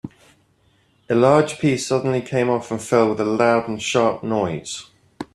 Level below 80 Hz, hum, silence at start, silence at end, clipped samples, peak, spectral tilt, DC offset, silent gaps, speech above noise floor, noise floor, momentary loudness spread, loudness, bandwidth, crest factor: -58 dBFS; none; 0.05 s; 0.1 s; under 0.1%; -2 dBFS; -5.5 dB/octave; under 0.1%; none; 41 dB; -60 dBFS; 13 LU; -19 LUFS; 13 kHz; 18 dB